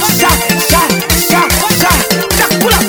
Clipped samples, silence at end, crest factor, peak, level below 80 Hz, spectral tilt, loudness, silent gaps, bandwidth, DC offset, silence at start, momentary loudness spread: 0.2%; 0 s; 10 dB; 0 dBFS; -24 dBFS; -3 dB/octave; -9 LUFS; none; over 20 kHz; under 0.1%; 0 s; 2 LU